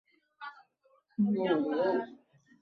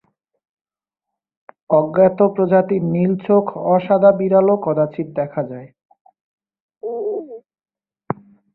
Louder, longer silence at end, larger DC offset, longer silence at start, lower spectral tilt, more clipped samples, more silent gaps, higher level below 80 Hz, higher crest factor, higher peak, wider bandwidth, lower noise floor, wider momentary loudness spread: second, -31 LUFS vs -17 LUFS; about the same, 0.45 s vs 0.4 s; neither; second, 0.4 s vs 1.7 s; second, -9 dB/octave vs -13 dB/octave; neither; second, none vs 5.85-5.89 s, 6.01-6.05 s, 6.21-6.38 s, 6.60-6.69 s; second, -78 dBFS vs -62 dBFS; about the same, 16 dB vs 16 dB; second, -18 dBFS vs -2 dBFS; first, 5 kHz vs 4.1 kHz; second, -69 dBFS vs -84 dBFS; about the same, 18 LU vs 16 LU